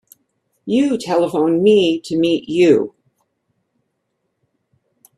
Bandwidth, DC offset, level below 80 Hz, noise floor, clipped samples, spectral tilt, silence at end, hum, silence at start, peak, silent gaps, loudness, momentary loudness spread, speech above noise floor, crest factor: 12.5 kHz; under 0.1%; -62 dBFS; -72 dBFS; under 0.1%; -6 dB/octave; 2.3 s; none; 0.65 s; -2 dBFS; none; -16 LUFS; 6 LU; 57 dB; 18 dB